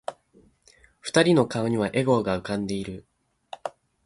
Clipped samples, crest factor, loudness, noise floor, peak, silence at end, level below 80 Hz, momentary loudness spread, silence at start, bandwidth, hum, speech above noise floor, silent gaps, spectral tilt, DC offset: under 0.1%; 22 dB; -24 LUFS; -59 dBFS; -6 dBFS; 0.35 s; -56 dBFS; 19 LU; 0.1 s; 11.5 kHz; none; 36 dB; none; -5.5 dB/octave; under 0.1%